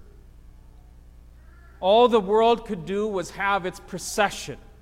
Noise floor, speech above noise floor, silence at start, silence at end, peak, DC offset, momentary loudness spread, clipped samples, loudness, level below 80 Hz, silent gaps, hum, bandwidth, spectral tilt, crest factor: -48 dBFS; 25 dB; 1.15 s; 0.2 s; -6 dBFS; under 0.1%; 15 LU; under 0.1%; -23 LUFS; -48 dBFS; none; 60 Hz at -50 dBFS; 16 kHz; -4 dB/octave; 18 dB